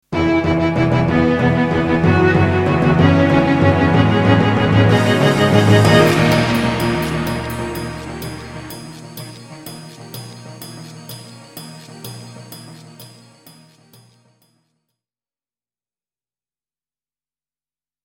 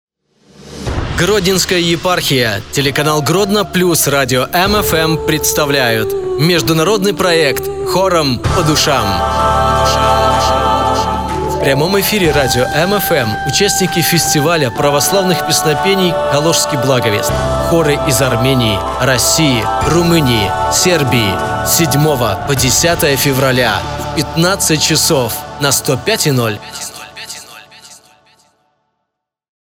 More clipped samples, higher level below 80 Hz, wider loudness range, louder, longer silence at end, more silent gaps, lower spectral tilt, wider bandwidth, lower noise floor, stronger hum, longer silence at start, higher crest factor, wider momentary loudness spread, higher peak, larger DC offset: neither; second, -38 dBFS vs -30 dBFS; first, 22 LU vs 2 LU; about the same, -14 LUFS vs -12 LUFS; first, 5 s vs 1.65 s; neither; first, -6.5 dB/octave vs -3.5 dB/octave; about the same, 17 kHz vs 17.5 kHz; first, under -90 dBFS vs -75 dBFS; neither; second, 0.1 s vs 0.6 s; about the same, 16 dB vs 12 dB; first, 22 LU vs 5 LU; about the same, 0 dBFS vs 0 dBFS; second, under 0.1% vs 0.5%